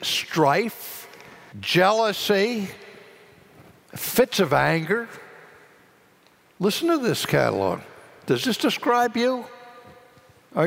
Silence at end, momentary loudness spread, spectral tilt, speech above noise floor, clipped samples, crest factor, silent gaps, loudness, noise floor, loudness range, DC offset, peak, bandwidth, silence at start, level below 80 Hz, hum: 0 s; 18 LU; -4.5 dB/octave; 35 dB; under 0.1%; 18 dB; none; -22 LUFS; -57 dBFS; 2 LU; under 0.1%; -6 dBFS; 16 kHz; 0 s; -62 dBFS; none